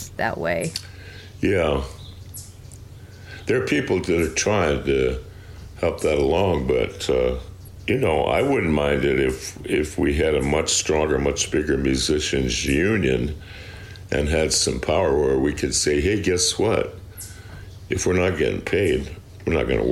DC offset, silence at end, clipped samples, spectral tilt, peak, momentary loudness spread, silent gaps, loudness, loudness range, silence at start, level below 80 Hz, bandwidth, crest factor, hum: under 0.1%; 0 s; under 0.1%; -4.5 dB/octave; -8 dBFS; 18 LU; none; -21 LUFS; 4 LU; 0 s; -36 dBFS; 15.5 kHz; 14 dB; none